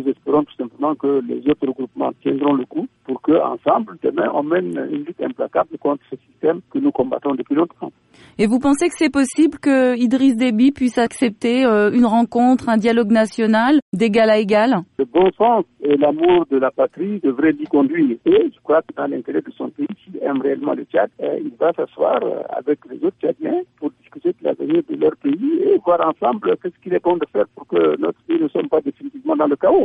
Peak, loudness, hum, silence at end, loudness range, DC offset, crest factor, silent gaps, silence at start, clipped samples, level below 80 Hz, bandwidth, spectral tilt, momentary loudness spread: -6 dBFS; -18 LUFS; none; 0 s; 6 LU; under 0.1%; 12 dB; 13.82-13.92 s; 0 s; under 0.1%; -56 dBFS; 11.5 kHz; -6 dB/octave; 9 LU